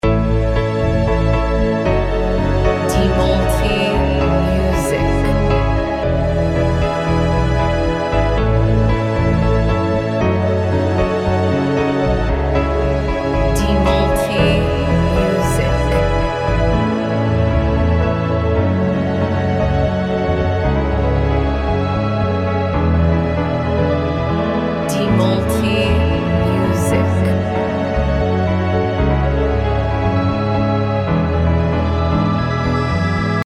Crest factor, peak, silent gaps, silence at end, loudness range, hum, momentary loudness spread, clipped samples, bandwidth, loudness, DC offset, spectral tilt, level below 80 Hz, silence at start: 14 dB; -2 dBFS; none; 0 s; 1 LU; none; 3 LU; under 0.1%; 15 kHz; -16 LUFS; under 0.1%; -7 dB/octave; -24 dBFS; 0.05 s